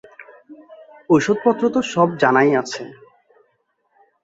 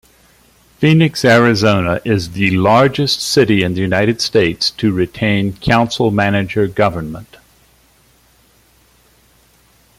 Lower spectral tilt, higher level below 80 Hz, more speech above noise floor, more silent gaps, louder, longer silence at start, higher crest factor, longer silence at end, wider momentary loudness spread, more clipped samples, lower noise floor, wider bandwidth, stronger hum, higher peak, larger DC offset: about the same, -5.5 dB/octave vs -5.5 dB/octave; second, -62 dBFS vs -44 dBFS; first, 50 dB vs 38 dB; neither; second, -17 LUFS vs -14 LUFS; second, 0.2 s vs 0.8 s; about the same, 18 dB vs 16 dB; second, 1.3 s vs 2.75 s; first, 15 LU vs 6 LU; neither; first, -67 dBFS vs -52 dBFS; second, 8 kHz vs 16 kHz; neither; about the same, -2 dBFS vs 0 dBFS; neither